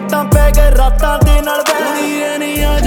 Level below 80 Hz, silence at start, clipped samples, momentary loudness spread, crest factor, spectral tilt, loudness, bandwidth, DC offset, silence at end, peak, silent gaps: -12 dBFS; 0 s; under 0.1%; 5 LU; 10 dB; -5 dB/octave; -13 LUFS; 18 kHz; under 0.1%; 0 s; 0 dBFS; none